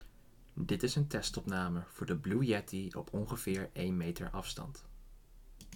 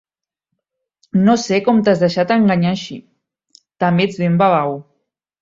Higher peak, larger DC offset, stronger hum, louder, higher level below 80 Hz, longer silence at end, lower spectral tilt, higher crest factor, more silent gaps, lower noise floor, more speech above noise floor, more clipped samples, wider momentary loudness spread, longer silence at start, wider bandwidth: second, -20 dBFS vs -2 dBFS; neither; neither; second, -37 LUFS vs -15 LUFS; about the same, -54 dBFS vs -56 dBFS; second, 0 s vs 0.6 s; about the same, -5.5 dB/octave vs -6.5 dB/octave; about the same, 18 dB vs 16 dB; neither; second, -59 dBFS vs -78 dBFS; second, 22 dB vs 63 dB; neither; about the same, 10 LU vs 11 LU; second, 0 s vs 1.15 s; first, 18.5 kHz vs 7.6 kHz